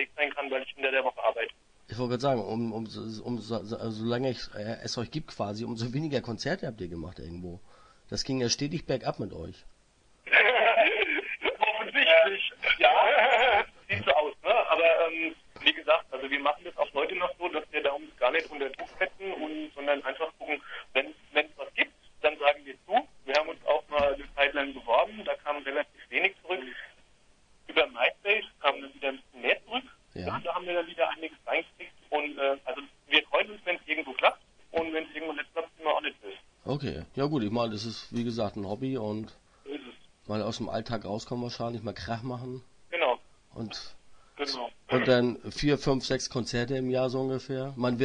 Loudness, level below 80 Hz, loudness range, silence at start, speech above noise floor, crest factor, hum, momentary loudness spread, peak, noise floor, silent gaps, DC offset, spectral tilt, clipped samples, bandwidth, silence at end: -29 LUFS; -58 dBFS; 11 LU; 0 s; 32 dB; 24 dB; none; 14 LU; -6 dBFS; -63 dBFS; none; under 0.1%; -4.5 dB/octave; under 0.1%; 10 kHz; 0 s